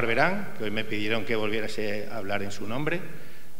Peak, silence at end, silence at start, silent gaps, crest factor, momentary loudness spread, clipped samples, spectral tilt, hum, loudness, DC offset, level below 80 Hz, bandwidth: -8 dBFS; 0 s; 0 s; none; 22 dB; 8 LU; under 0.1%; -5 dB/octave; none; -29 LUFS; 5%; -58 dBFS; 16 kHz